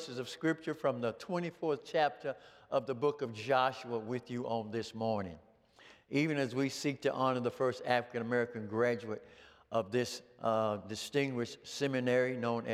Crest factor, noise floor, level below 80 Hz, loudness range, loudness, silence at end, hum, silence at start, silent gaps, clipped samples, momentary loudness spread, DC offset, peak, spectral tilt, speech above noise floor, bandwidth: 20 dB; -61 dBFS; -78 dBFS; 2 LU; -35 LUFS; 0 s; none; 0 s; none; under 0.1%; 8 LU; under 0.1%; -14 dBFS; -5.5 dB/octave; 26 dB; 15.5 kHz